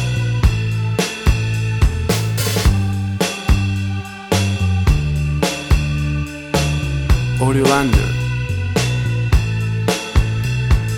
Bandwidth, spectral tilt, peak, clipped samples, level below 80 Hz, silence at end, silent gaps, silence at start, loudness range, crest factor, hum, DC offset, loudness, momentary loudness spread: 20 kHz; -5.5 dB/octave; 0 dBFS; under 0.1%; -22 dBFS; 0 s; none; 0 s; 1 LU; 16 dB; none; under 0.1%; -18 LUFS; 4 LU